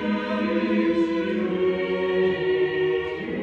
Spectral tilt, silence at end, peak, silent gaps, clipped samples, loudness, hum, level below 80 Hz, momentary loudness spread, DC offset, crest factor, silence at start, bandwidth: -7.5 dB/octave; 0 s; -12 dBFS; none; under 0.1%; -24 LUFS; none; -56 dBFS; 3 LU; under 0.1%; 12 dB; 0 s; 6.8 kHz